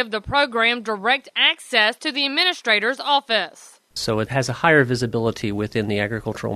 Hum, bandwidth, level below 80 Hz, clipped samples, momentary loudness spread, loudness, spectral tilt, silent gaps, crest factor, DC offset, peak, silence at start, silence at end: none; 13.5 kHz; -50 dBFS; under 0.1%; 8 LU; -20 LUFS; -4 dB/octave; none; 20 dB; under 0.1%; -2 dBFS; 0 s; 0 s